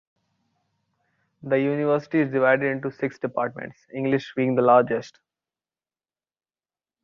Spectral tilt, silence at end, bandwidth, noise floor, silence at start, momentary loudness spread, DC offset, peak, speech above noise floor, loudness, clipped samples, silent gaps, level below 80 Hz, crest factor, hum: -8 dB/octave; 1.95 s; 7.2 kHz; under -90 dBFS; 1.45 s; 12 LU; under 0.1%; -4 dBFS; over 67 dB; -23 LUFS; under 0.1%; none; -70 dBFS; 22 dB; none